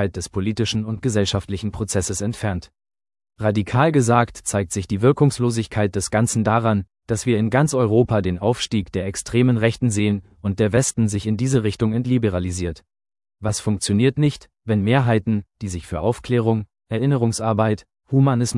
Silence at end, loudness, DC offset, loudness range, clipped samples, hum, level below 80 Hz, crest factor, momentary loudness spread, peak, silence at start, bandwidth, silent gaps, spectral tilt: 0 s; -21 LUFS; under 0.1%; 3 LU; under 0.1%; none; -48 dBFS; 18 dB; 8 LU; -2 dBFS; 0 s; 12 kHz; none; -6 dB/octave